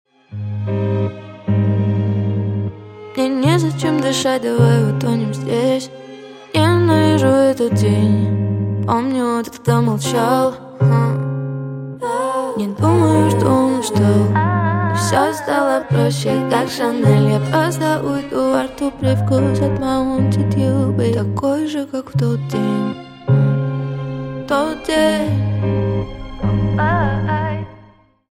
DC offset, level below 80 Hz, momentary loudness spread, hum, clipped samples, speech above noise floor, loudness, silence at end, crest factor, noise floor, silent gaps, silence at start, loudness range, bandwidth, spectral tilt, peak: under 0.1%; -42 dBFS; 10 LU; none; under 0.1%; 32 dB; -17 LUFS; 0.55 s; 16 dB; -47 dBFS; none; 0.3 s; 3 LU; 15.5 kHz; -6.5 dB/octave; 0 dBFS